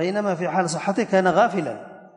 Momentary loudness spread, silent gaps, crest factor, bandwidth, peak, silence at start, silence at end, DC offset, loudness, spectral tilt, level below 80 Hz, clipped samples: 10 LU; none; 16 dB; 11 kHz; -6 dBFS; 0 s; 0.1 s; under 0.1%; -22 LUFS; -5.5 dB/octave; -64 dBFS; under 0.1%